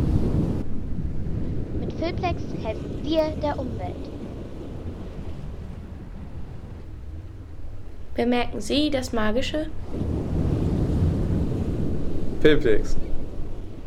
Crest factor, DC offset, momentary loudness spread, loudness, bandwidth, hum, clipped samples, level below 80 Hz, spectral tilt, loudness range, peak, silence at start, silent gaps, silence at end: 20 dB; under 0.1%; 16 LU; -27 LUFS; 10.5 kHz; none; under 0.1%; -32 dBFS; -7 dB/octave; 13 LU; -4 dBFS; 0 s; none; 0 s